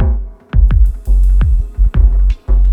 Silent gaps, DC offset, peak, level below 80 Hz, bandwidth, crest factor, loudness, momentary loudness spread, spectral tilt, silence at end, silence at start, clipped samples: none; under 0.1%; 0 dBFS; -10 dBFS; 3.1 kHz; 10 dB; -15 LUFS; 4 LU; -9 dB/octave; 0 s; 0 s; under 0.1%